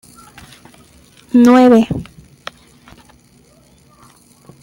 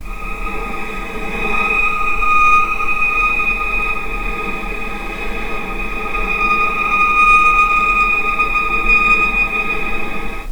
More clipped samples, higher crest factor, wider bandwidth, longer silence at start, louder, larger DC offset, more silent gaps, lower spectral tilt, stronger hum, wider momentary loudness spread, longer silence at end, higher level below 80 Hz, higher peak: neither; about the same, 16 dB vs 16 dB; second, 12.5 kHz vs over 20 kHz; first, 1.35 s vs 0 s; first, -11 LUFS vs -15 LUFS; neither; neither; first, -6.5 dB/octave vs -4 dB/octave; neither; first, 26 LU vs 14 LU; first, 2.6 s vs 0 s; second, -48 dBFS vs -28 dBFS; about the same, 0 dBFS vs 0 dBFS